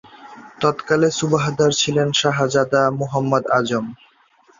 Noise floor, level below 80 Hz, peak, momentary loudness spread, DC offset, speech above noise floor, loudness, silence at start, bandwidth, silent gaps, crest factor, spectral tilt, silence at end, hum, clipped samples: -55 dBFS; -56 dBFS; -2 dBFS; 5 LU; under 0.1%; 37 dB; -18 LUFS; 0.15 s; 7.8 kHz; none; 18 dB; -4.5 dB/octave; 0.65 s; none; under 0.1%